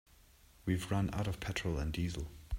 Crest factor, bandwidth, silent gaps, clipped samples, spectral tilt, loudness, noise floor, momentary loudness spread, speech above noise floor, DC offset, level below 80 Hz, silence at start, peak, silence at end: 18 dB; 16 kHz; none; under 0.1%; -6 dB/octave; -38 LUFS; -63 dBFS; 6 LU; 27 dB; under 0.1%; -48 dBFS; 0.65 s; -20 dBFS; 0 s